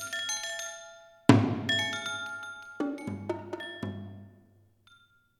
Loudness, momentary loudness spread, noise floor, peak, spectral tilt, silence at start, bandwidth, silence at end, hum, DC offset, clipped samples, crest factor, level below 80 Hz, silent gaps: -30 LUFS; 20 LU; -63 dBFS; -2 dBFS; -4.5 dB/octave; 0 s; 14 kHz; 1.1 s; none; under 0.1%; under 0.1%; 30 dB; -70 dBFS; none